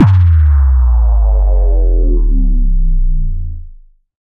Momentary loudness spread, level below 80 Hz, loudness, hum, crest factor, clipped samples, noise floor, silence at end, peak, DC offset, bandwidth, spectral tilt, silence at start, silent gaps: 12 LU; -10 dBFS; -13 LUFS; none; 10 dB; under 0.1%; -36 dBFS; 0.45 s; 0 dBFS; under 0.1%; 2.9 kHz; -11 dB/octave; 0 s; none